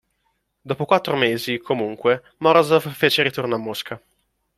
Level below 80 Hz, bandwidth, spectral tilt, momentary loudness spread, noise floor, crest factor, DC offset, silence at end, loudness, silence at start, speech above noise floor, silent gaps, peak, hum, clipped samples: -64 dBFS; 15.5 kHz; -5 dB/octave; 13 LU; -70 dBFS; 20 dB; under 0.1%; 0.6 s; -20 LUFS; 0.65 s; 50 dB; none; -2 dBFS; none; under 0.1%